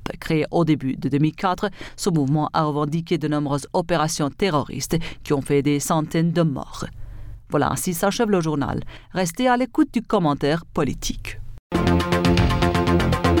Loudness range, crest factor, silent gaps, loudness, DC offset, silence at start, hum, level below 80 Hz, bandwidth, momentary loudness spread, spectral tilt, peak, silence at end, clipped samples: 2 LU; 16 dB; 11.59-11.70 s; -22 LUFS; under 0.1%; 0 s; none; -38 dBFS; 19 kHz; 9 LU; -5.5 dB/octave; -6 dBFS; 0 s; under 0.1%